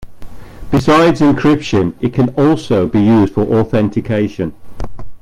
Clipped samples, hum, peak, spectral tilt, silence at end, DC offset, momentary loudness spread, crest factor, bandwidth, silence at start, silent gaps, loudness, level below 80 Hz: under 0.1%; none; 0 dBFS; -7.5 dB/octave; 0.05 s; under 0.1%; 13 LU; 14 dB; 12.5 kHz; 0 s; none; -13 LUFS; -34 dBFS